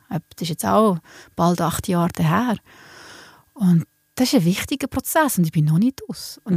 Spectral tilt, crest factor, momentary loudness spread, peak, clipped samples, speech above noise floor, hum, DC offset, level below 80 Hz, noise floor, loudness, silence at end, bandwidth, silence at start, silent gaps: -6 dB/octave; 16 dB; 14 LU; -4 dBFS; under 0.1%; 25 dB; none; under 0.1%; -50 dBFS; -45 dBFS; -20 LUFS; 0 s; 15.5 kHz; 0.1 s; none